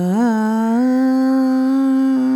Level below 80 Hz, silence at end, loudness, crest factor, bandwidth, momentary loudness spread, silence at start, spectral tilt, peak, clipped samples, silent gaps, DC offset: -76 dBFS; 0 s; -16 LUFS; 8 dB; 12 kHz; 1 LU; 0 s; -7.5 dB/octave; -8 dBFS; under 0.1%; none; under 0.1%